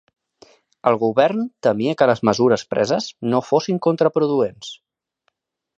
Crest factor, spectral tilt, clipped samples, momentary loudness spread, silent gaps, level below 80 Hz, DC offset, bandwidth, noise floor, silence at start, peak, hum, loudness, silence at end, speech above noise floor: 20 dB; -6 dB/octave; under 0.1%; 6 LU; none; -62 dBFS; under 0.1%; 8 kHz; -71 dBFS; 0.85 s; 0 dBFS; none; -19 LUFS; 1.05 s; 52 dB